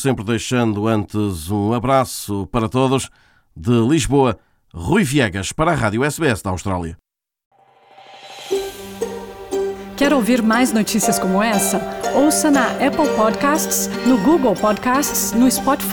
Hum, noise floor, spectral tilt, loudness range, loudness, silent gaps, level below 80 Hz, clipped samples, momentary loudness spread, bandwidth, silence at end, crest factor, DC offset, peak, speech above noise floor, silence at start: none; -48 dBFS; -4.5 dB/octave; 8 LU; -18 LUFS; 7.46-7.51 s; -42 dBFS; under 0.1%; 11 LU; 19.5 kHz; 0 s; 16 dB; under 0.1%; -2 dBFS; 31 dB; 0 s